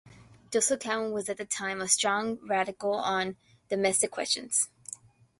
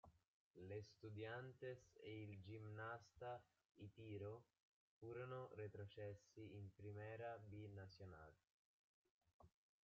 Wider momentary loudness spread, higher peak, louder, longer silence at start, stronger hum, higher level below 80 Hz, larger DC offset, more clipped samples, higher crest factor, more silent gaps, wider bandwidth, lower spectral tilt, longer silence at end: about the same, 9 LU vs 8 LU; first, -10 dBFS vs -42 dBFS; first, -29 LUFS vs -57 LUFS; about the same, 0.05 s vs 0.05 s; neither; first, -70 dBFS vs -86 dBFS; neither; neither; first, 22 dB vs 16 dB; second, none vs 0.28-0.54 s, 3.71-3.75 s, 4.62-5.01 s, 8.50-9.05 s, 9.11-9.21 s, 9.34-9.40 s; first, 12 kHz vs 7.2 kHz; second, -1.5 dB/octave vs -6 dB/octave; about the same, 0.45 s vs 0.35 s